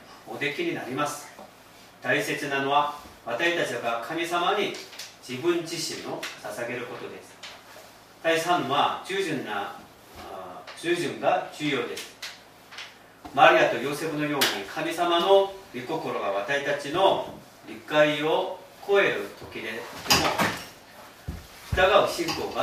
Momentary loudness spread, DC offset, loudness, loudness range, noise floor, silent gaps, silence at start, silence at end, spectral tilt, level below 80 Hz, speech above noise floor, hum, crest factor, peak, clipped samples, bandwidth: 20 LU; under 0.1%; -25 LUFS; 7 LU; -51 dBFS; none; 0 s; 0 s; -3.5 dB/octave; -54 dBFS; 25 dB; none; 24 dB; -2 dBFS; under 0.1%; 15.5 kHz